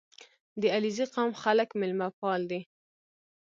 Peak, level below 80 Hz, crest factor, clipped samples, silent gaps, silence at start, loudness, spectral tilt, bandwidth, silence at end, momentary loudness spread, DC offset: -12 dBFS; -80 dBFS; 18 dB; under 0.1%; 0.40-0.56 s, 2.13-2.22 s; 0.2 s; -30 LUFS; -5 dB/octave; 7.6 kHz; 0.8 s; 8 LU; under 0.1%